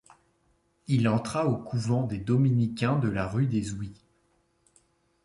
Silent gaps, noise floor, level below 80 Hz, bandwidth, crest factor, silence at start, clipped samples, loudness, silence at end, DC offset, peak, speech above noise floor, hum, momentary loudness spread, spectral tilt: none; -69 dBFS; -54 dBFS; 11.5 kHz; 16 dB; 0.9 s; under 0.1%; -27 LUFS; 1.3 s; under 0.1%; -12 dBFS; 43 dB; none; 10 LU; -7.5 dB/octave